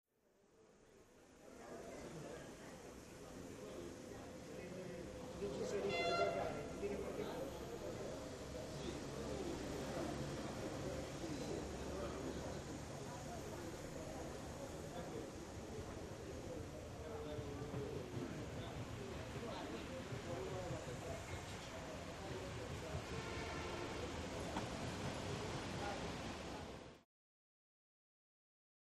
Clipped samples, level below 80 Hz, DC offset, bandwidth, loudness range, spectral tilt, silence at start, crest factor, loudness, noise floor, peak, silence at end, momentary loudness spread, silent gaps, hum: under 0.1%; -60 dBFS; under 0.1%; 13.5 kHz; 8 LU; -5 dB/octave; 0.5 s; 22 dB; -47 LUFS; -75 dBFS; -26 dBFS; 1.95 s; 8 LU; none; none